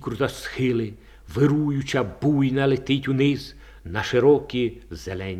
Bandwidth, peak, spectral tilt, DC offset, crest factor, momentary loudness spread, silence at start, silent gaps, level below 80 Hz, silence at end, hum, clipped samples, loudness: 14 kHz; -6 dBFS; -7 dB/octave; under 0.1%; 18 dB; 14 LU; 0 s; none; -48 dBFS; 0 s; none; under 0.1%; -23 LUFS